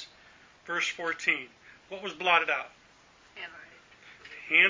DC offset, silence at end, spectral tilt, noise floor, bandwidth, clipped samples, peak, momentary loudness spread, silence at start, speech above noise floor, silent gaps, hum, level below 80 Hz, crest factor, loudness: under 0.1%; 0 s; -1.5 dB/octave; -59 dBFS; 7.6 kHz; under 0.1%; -8 dBFS; 24 LU; 0 s; 29 dB; none; none; -74 dBFS; 24 dB; -28 LUFS